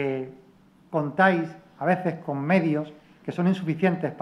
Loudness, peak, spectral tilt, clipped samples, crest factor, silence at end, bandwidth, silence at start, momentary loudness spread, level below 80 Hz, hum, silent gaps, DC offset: -25 LUFS; -6 dBFS; -8.5 dB/octave; under 0.1%; 20 dB; 0 s; 9.8 kHz; 0 s; 14 LU; -70 dBFS; none; none; under 0.1%